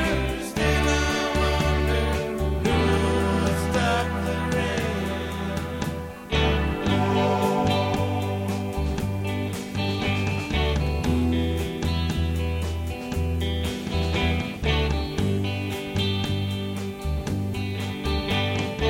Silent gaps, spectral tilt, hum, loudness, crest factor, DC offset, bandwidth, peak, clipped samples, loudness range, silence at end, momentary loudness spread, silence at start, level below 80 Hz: none; -5.5 dB/octave; none; -25 LUFS; 16 dB; under 0.1%; 16.5 kHz; -8 dBFS; under 0.1%; 3 LU; 0 s; 7 LU; 0 s; -32 dBFS